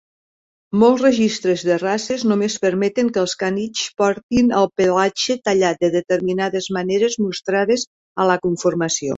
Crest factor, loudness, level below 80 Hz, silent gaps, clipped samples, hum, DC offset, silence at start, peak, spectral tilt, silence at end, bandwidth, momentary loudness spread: 16 dB; -18 LUFS; -56 dBFS; 4.23-4.29 s, 7.87-8.15 s; under 0.1%; none; under 0.1%; 0.7 s; -2 dBFS; -4.5 dB/octave; 0 s; 8 kHz; 6 LU